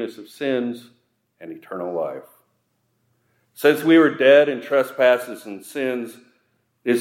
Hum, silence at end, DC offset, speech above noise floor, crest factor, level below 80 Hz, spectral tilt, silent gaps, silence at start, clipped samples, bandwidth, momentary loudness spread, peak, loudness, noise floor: none; 0 s; under 0.1%; 50 dB; 18 dB; -80 dBFS; -5 dB/octave; none; 0 s; under 0.1%; 16 kHz; 21 LU; -2 dBFS; -19 LUFS; -69 dBFS